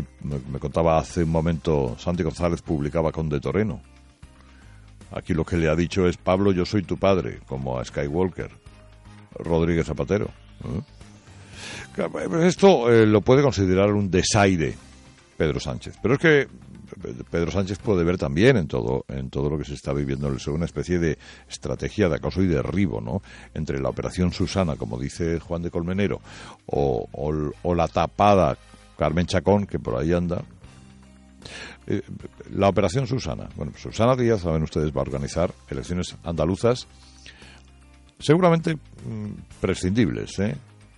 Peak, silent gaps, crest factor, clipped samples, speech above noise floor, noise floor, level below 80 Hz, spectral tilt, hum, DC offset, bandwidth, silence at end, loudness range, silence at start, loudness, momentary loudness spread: -4 dBFS; none; 20 dB; under 0.1%; 28 dB; -51 dBFS; -42 dBFS; -6.5 dB/octave; none; under 0.1%; 11 kHz; 0.35 s; 7 LU; 0 s; -23 LUFS; 16 LU